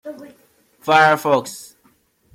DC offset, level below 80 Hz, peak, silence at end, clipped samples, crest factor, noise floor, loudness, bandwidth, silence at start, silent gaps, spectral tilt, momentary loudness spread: under 0.1%; -68 dBFS; 0 dBFS; 0.75 s; under 0.1%; 20 dB; -59 dBFS; -15 LUFS; 16 kHz; 0.05 s; none; -4 dB/octave; 23 LU